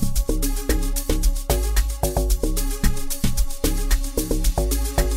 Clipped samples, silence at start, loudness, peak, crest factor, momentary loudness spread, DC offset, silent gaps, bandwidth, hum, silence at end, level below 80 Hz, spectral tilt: under 0.1%; 0 s; -24 LUFS; -6 dBFS; 14 dB; 2 LU; under 0.1%; none; 16.5 kHz; none; 0 s; -22 dBFS; -4.5 dB/octave